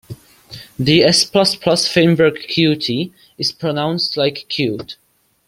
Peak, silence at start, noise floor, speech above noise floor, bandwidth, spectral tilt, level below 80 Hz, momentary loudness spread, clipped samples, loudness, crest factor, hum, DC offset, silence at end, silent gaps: 0 dBFS; 0.1 s; -39 dBFS; 23 dB; 16 kHz; -4.5 dB/octave; -52 dBFS; 13 LU; under 0.1%; -15 LUFS; 16 dB; none; under 0.1%; 0.55 s; none